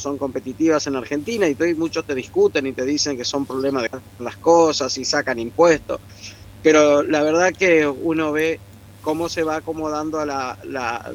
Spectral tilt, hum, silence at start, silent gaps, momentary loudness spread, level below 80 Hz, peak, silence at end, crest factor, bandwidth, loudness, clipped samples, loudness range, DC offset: -4 dB/octave; none; 0 s; none; 12 LU; -52 dBFS; -2 dBFS; 0 s; 18 dB; 16 kHz; -20 LUFS; under 0.1%; 4 LU; under 0.1%